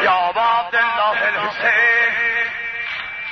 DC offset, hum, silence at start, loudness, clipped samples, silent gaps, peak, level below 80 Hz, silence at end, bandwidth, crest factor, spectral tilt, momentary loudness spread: under 0.1%; none; 0 s; -17 LUFS; under 0.1%; none; -4 dBFS; -56 dBFS; 0 s; 6.4 kHz; 14 dB; -3 dB/octave; 10 LU